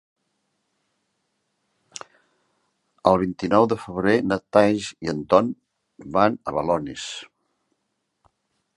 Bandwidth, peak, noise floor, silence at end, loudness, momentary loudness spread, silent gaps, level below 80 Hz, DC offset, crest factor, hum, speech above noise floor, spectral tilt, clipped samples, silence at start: 11.5 kHz; -2 dBFS; -76 dBFS; 1.5 s; -22 LUFS; 19 LU; none; -56 dBFS; under 0.1%; 24 dB; none; 55 dB; -6 dB/octave; under 0.1%; 3.05 s